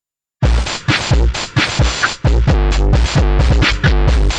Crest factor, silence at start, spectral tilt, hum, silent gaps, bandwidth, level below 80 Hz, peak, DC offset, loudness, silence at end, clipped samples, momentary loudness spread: 12 dB; 0.4 s; -5 dB/octave; none; none; 9 kHz; -14 dBFS; -2 dBFS; under 0.1%; -14 LUFS; 0 s; under 0.1%; 3 LU